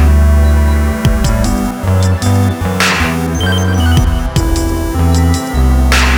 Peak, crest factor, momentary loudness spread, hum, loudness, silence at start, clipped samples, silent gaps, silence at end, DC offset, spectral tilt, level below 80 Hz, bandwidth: 0 dBFS; 10 dB; 5 LU; none; -12 LUFS; 0 s; under 0.1%; none; 0 s; under 0.1%; -5.5 dB/octave; -14 dBFS; 20 kHz